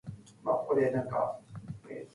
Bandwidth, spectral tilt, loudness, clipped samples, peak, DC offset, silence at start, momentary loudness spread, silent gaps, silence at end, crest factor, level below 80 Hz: 11.5 kHz; -8.5 dB/octave; -31 LUFS; under 0.1%; -16 dBFS; under 0.1%; 0.05 s; 17 LU; none; 0.1 s; 16 dB; -66 dBFS